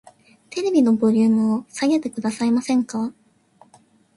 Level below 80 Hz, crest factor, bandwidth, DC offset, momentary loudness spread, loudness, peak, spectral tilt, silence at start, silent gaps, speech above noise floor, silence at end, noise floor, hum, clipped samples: -66 dBFS; 14 dB; 11.5 kHz; under 0.1%; 10 LU; -20 LUFS; -8 dBFS; -6 dB/octave; 0.5 s; none; 36 dB; 1.05 s; -55 dBFS; none; under 0.1%